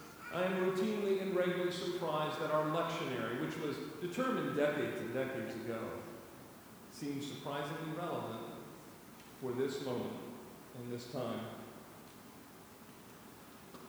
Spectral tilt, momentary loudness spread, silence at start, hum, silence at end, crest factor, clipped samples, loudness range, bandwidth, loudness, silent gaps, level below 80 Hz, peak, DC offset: -5.5 dB/octave; 20 LU; 0 s; none; 0 s; 18 dB; under 0.1%; 9 LU; over 20 kHz; -38 LUFS; none; -74 dBFS; -20 dBFS; under 0.1%